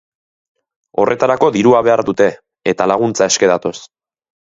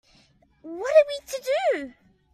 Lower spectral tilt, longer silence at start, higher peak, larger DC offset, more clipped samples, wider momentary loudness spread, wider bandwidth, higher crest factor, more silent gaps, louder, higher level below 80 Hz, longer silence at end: first, -4 dB/octave vs -2 dB/octave; first, 0.95 s vs 0.65 s; first, 0 dBFS vs -6 dBFS; neither; neither; second, 11 LU vs 18 LU; second, 8 kHz vs 14.5 kHz; about the same, 16 dB vs 20 dB; neither; first, -14 LUFS vs -23 LUFS; first, -54 dBFS vs -66 dBFS; first, 0.65 s vs 0.45 s